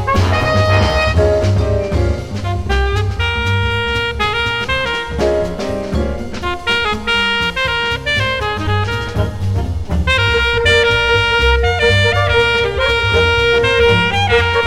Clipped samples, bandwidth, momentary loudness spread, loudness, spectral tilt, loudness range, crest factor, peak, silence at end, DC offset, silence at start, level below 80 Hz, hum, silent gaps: under 0.1%; 12.5 kHz; 8 LU; -14 LUFS; -5 dB/octave; 5 LU; 14 dB; 0 dBFS; 0 s; under 0.1%; 0 s; -24 dBFS; none; none